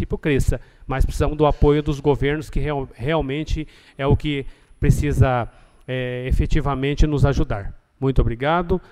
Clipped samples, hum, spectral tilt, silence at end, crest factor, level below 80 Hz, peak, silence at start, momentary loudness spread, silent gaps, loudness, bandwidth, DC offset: under 0.1%; none; -7 dB/octave; 0.1 s; 18 dB; -26 dBFS; -2 dBFS; 0 s; 10 LU; none; -22 LUFS; 14 kHz; under 0.1%